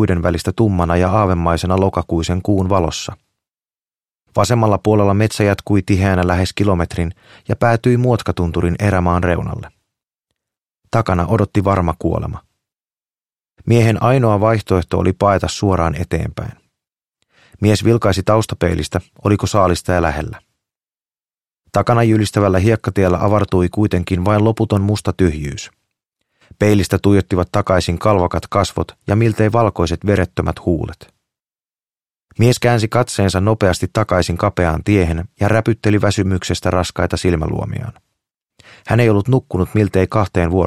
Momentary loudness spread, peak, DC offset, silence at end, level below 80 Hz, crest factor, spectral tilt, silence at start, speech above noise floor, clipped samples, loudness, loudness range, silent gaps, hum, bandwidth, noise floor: 8 LU; 0 dBFS; under 0.1%; 0 s; -34 dBFS; 16 dB; -6.5 dB/octave; 0 s; over 75 dB; under 0.1%; -16 LUFS; 3 LU; none; none; 14 kHz; under -90 dBFS